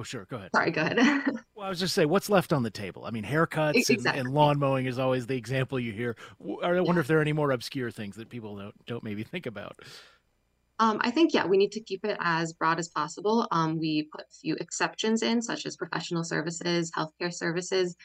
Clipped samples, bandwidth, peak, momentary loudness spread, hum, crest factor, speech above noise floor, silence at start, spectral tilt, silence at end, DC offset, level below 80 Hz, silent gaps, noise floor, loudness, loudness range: under 0.1%; 16 kHz; -8 dBFS; 15 LU; none; 20 dB; 44 dB; 0 s; -5 dB/octave; 0 s; under 0.1%; -66 dBFS; none; -72 dBFS; -28 LUFS; 4 LU